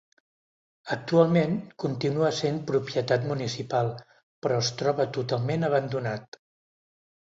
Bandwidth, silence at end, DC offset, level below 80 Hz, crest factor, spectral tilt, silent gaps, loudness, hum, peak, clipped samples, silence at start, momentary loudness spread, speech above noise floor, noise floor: 8 kHz; 1.05 s; under 0.1%; -66 dBFS; 22 dB; -6 dB/octave; 4.23-4.42 s; -27 LUFS; none; -6 dBFS; under 0.1%; 0.85 s; 11 LU; over 64 dB; under -90 dBFS